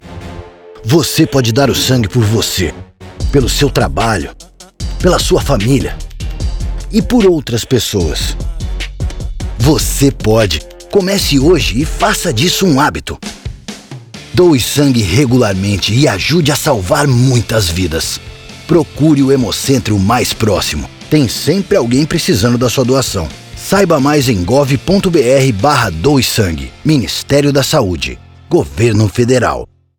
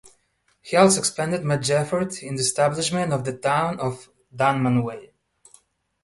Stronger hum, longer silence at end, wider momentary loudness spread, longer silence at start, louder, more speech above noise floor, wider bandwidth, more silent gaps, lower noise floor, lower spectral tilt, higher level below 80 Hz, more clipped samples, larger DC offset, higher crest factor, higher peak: neither; second, 0.35 s vs 1 s; about the same, 13 LU vs 11 LU; second, 0.05 s vs 0.65 s; first, -12 LUFS vs -22 LUFS; second, 20 dB vs 45 dB; first, 19.5 kHz vs 12 kHz; neither; second, -31 dBFS vs -67 dBFS; about the same, -5 dB/octave vs -4.5 dB/octave; first, -26 dBFS vs -58 dBFS; neither; neither; second, 12 dB vs 20 dB; first, 0 dBFS vs -4 dBFS